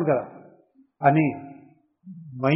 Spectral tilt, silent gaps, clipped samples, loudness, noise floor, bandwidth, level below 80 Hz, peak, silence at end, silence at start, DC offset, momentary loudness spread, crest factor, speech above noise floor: -7 dB/octave; none; under 0.1%; -23 LUFS; -58 dBFS; 5.4 kHz; -66 dBFS; -4 dBFS; 0 s; 0 s; under 0.1%; 24 LU; 20 dB; 36 dB